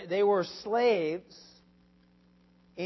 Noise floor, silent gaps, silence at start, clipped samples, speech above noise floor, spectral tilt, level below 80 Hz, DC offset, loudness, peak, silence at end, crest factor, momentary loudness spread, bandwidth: -63 dBFS; none; 0 s; under 0.1%; 35 dB; -5.5 dB/octave; -72 dBFS; under 0.1%; -28 LUFS; -16 dBFS; 0 s; 16 dB; 13 LU; 6 kHz